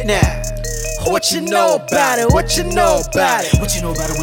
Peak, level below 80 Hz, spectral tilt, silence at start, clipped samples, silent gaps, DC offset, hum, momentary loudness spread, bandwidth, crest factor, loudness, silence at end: 0 dBFS; -24 dBFS; -4 dB/octave; 0 s; under 0.1%; none; under 0.1%; none; 7 LU; 18 kHz; 16 dB; -15 LUFS; 0 s